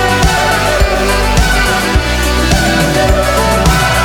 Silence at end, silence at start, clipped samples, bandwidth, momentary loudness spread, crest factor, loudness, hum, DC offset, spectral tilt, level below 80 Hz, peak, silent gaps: 0 s; 0 s; under 0.1%; 18 kHz; 2 LU; 10 dB; -11 LUFS; none; under 0.1%; -4 dB/octave; -16 dBFS; 0 dBFS; none